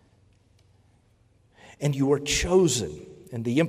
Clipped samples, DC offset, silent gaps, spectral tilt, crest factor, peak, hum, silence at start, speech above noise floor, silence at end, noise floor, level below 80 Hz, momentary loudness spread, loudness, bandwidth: under 0.1%; under 0.1%; none; -4.5 dB/octave; 18 dB; -10 dBFS; none; 1.8 s; 38 dB; 0 s; -62 dBFS; -46 dBFS; 16 LU; -24 LUFS; 16 kHz